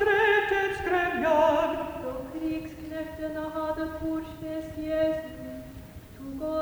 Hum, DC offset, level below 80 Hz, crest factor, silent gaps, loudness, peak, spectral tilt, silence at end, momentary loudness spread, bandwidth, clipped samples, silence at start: none; under 0.1%; -50 dBFS; 18 dB; none; -28 LUFS; -10 dBFS; -5.5 dB/octave; 0 s; 18 LU; over 20 kHz; under 0.1%; 0 s